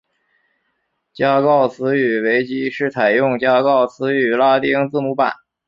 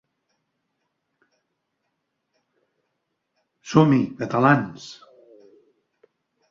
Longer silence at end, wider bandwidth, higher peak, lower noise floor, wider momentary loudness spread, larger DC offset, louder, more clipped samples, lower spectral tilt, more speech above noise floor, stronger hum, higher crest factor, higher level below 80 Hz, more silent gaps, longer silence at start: second, 0.35 s vs 1.55 s; about the same, 7.4 kHz vs 7.6 kHz; about the same, -2 dBFS vs -2 dBFS; second, -70 dBFS vs -77 dBFS; second, 6 LU vs 20 LU; neither; first, -16 LUFS vs -20 LUFS; neither; about the same, -7.5 dB/octave vs -7 dB/octave; second, 54 dB vs 58 dB; neither; second, 14 dB vs 24 dB; about the same, -62 dBFS vs -64 dBFS; neither; second, 1.2 s vs 3.65 s